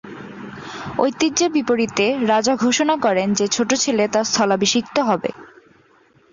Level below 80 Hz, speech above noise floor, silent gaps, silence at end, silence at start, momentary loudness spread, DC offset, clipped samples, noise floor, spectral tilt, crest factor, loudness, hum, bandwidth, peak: -58 dBFS; 36 dB; none; 0.85 s; 0.05 s; 14 LU; under 0.1%; under 0.1%; -55 dBFS; -3 dB/octave; 18 dB; -18 LUFS; none; 7.6 kHz; -2 dBFS